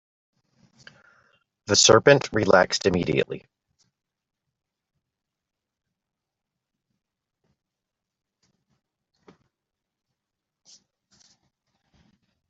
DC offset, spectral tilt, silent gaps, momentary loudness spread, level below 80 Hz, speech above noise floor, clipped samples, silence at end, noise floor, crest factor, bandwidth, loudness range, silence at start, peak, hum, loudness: under 0.1%; -3 dB/octave; none; 18 LU; -60 dBFS; 66 dB; under 0.1%; 9.1 s; -86 dBFS; 26 dB; 8.2 kHz; 12 LU; 1.7 s; -2 dBFS; none; -19 LUFS